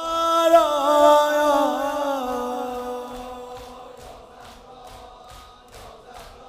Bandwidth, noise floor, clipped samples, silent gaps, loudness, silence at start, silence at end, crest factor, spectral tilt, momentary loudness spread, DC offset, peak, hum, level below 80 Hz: 15.5 kHz; -45 dBFS; under 0.1%; none; -19 LUFS; 0 s; 0 s; 18 dB; -3 dB/octave; 27 LU; under 0.1%; -4 dBFS; none; -52 dBFS